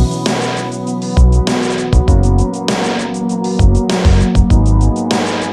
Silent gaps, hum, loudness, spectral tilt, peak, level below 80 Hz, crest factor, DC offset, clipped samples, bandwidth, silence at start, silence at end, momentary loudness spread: none; none; -14 LUFS; -6 dB/octave; 0 dBFS; -16 dBFS; 12 dB; under 0.1%; under 0.1%; 11.5 kHz; 0 s; 0 s; 7 LU